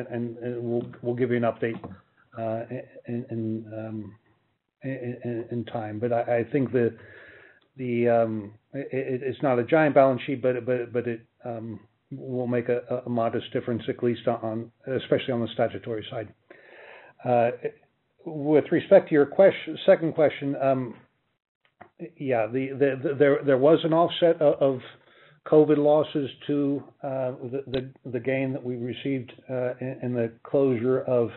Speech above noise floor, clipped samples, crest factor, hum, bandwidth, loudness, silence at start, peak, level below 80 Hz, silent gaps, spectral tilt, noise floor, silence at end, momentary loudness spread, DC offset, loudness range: 43 dB; under 0.1%; 20 dB; none; 4.2 kHz; -25 LUFS; 0 s; -6 dBFS; -68 dBFS; 21.48-21.61 s; -6 dB/octave; -68 dBFS; 0 s; 16 LU; under 0.1%; 8 LU